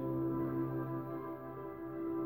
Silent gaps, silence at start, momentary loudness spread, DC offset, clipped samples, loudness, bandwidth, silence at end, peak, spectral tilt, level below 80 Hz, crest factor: none; 0 s; 9 LU; under 0.1%; under 0.1%; -40 LUFS; 16.5 kHz; 0 s; -28 dBFS; -11.5 dB/octave; -64 dBFS; 12 dB